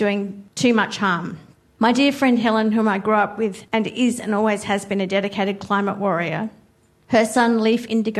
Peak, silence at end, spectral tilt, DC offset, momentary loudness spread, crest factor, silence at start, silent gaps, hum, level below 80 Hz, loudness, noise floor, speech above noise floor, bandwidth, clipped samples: -4 dBFS; 0 s; -5 dB/octave; under 0.1%; 8 LU; 16 dB; 0 s; none; none; -62 dBFS; -20 LUFS; -56 dBFS; 36 dB; 13 kHz; under 0.1%